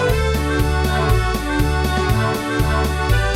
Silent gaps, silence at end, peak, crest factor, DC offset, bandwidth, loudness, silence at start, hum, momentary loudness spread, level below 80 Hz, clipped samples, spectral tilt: none; 0 s; -2 dBFS; 14 dB; under 0.1%; 16.5 kHz; -19 LUFS; 0 s; none; 2 LU; -22 dBFS; under 0.1%; -5.5 dB/octave